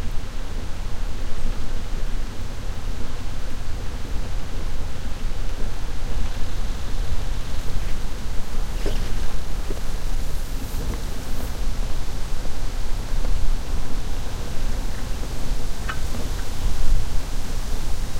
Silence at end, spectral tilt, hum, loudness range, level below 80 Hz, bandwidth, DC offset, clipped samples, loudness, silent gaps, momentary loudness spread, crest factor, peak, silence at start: 0 s; -4.5 dB/octave; none; 3 LU; -24 dBFS; 13 kHz; under 0.1%; under 0.1%; -31 LUFS; none; 4 LU; 14 dB; -4 dBFS; 0 s